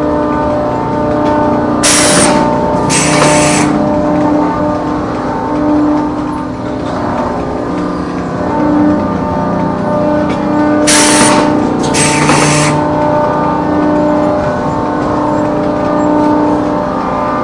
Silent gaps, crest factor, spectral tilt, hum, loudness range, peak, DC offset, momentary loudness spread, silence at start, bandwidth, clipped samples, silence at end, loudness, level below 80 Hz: none; 10 dB; -4.5 dB/octave; none; 6 LU; 0 dBFS; under 0.1%; 9 LU; 0 s; 12 kHz; 0.1%; 0 s; -11 LUFS; -34 dBFS